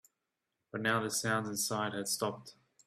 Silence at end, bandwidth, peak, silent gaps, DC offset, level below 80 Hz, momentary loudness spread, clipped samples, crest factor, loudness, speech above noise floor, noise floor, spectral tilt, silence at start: 0.35 s; 16 kHz; -16 dBFS; none; under 0.1%; -74 dBFS; 7 LU; under 0.1%; 20 dB; -34 LUFS; 52 dB; -87 dBFS; -3 dB/octave; 0.75 s